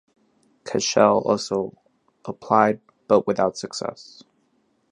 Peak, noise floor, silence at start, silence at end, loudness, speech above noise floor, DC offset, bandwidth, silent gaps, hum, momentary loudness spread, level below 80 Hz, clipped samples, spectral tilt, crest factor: -2 dBFS; -66 dBFS; 0.65 s; 0.9 s; -22 LUFS; 45 dB; under 0.1%; 11 kHz; none; none; 19 LU; -64 dBFS; under 0.1%; -4.5 dB/octave; 22 dB